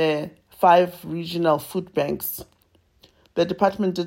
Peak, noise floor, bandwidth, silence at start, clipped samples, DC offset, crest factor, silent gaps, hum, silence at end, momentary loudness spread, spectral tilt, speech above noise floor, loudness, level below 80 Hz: -4 dBFS; -62 dBFS; 16.5 kHz; 0 s; under 0.1%; under 0.1%; 18 dB; none; none; 0 s; 14 LU; -5.5 dB/octave; 40 dB; -22 LUFS; -58 dBFS